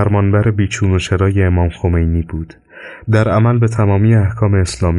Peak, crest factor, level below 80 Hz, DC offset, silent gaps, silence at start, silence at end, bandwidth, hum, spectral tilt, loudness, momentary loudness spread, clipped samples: -2 dBFS; 10 dB; -28 dBFS; under 0.1%; none; 0 s; 0 s; 11.5 kHz; none; -7 dB/octave; -14 LUFS; 14 LU; under 0.1%